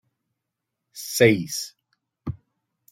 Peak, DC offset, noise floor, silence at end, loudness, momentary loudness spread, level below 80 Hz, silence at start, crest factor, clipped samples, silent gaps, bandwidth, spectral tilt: -4 dBFS; under 0.1%; -83 dBFS; 0.55 s; -21 LUFS; 21 LU; -58 dBFS; 0.95 s; 24 dB; under 0.1%; none; 16.5 kHz; -4.5 dB/octave